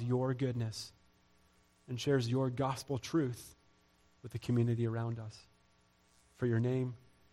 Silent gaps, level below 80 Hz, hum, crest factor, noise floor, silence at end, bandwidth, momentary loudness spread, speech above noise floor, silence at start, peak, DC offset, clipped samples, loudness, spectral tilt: none; -68 dBFS; none; 16 dB; -70 dBFS; 0.35 s; 13 kHz; 17 LU; 35 dB; 0 s; -20 dBFS; under 0.1%; under 0.1%; -36 LUFS; -7 dB/octave